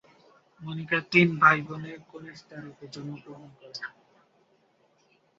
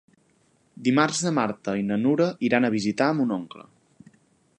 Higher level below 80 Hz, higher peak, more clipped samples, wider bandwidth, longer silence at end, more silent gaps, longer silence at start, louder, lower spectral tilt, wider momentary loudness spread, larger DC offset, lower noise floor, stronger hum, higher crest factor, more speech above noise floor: about the same, -70 dBFS vs -68 dBFS; about the same, -4 dBFS vs -6 dBFS; neither; second, 7.6 kHz vs 11 kHz; first, 1.5 s vs 1 s; neither; second, 0.6 s vs 0.8 s; about the same, -23 LUFS vs -24 LUFS; about the same, -4 dB/octave vs -5 dB/octave; first, 24 LU vs 7 LU; neither; about the same, -66 dBFS vs -64 dBFS; neither; first, 26 dB vs 20 dB; about the same, 38 dB vs 41 dB